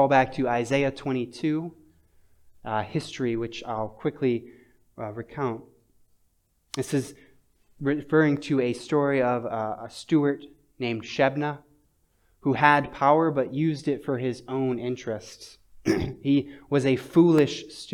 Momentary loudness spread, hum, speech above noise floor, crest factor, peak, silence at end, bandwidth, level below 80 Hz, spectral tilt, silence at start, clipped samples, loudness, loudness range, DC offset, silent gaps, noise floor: 15 LU; none; 43 dB; 24 dB; -2 dBFS; 0 s; 14 kHz; -58 dBFS; -6.5 dB/octave; 0 s; under 0.1%; -26 LUFS; 8 LU; under 0.1%; none; -68 dBFS